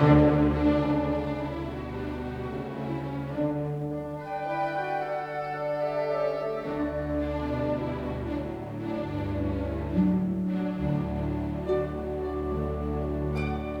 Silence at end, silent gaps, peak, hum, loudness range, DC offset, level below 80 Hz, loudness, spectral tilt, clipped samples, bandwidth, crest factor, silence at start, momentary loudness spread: 0 s; none; -8 dBFS; none; 3 LU; under 0.1%; -42 dBFS; -29 LUFS; -9 dB/octave; under 0.1%; 8.2 kHz; 20 dB; 0 s; 9 LU